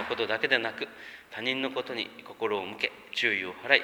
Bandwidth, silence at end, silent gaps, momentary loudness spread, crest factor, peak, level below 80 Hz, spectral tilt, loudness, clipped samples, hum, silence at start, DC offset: over 20 kHz; 0 s; none; 12 LU; 28 dB; -4 dBFS; -72 dBFS; -3.5 dB/octave; -30 LUFS; under 0.1%; none; 0 s; under 0.1%